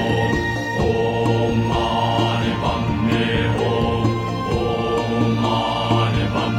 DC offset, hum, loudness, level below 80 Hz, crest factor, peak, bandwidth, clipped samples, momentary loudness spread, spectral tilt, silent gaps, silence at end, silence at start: under 0.1%; none; -20 LUFS; -34 dBFS; 16 dB; -4 dBFS; 12 kHz; under 0.1%; 2 LU; -6.5 dB/octave; none; 0 s; 0 s